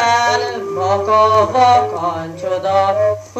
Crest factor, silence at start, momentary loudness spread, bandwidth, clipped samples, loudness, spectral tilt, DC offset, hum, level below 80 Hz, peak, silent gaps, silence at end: 14 dB; 0 s; 10 LU; 13.5 kHz; under 0.1%; -15 LUFS; -4 dB/octave; under 0.1%; none; -54 dBFS; -2 dBFS; none; 0 s